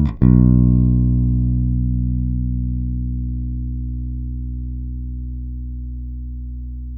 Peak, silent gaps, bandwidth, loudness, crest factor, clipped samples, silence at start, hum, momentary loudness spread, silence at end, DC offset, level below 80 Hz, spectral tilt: 0 dBFS; none; 2.4 kHz; -20 LUFS; 18 dB; under 0.1%; 0 s; 60 Hz at -75 dBFS; 17 LU; 0 s; under 0.1%; -22 dBFS; -13.5 dB/octave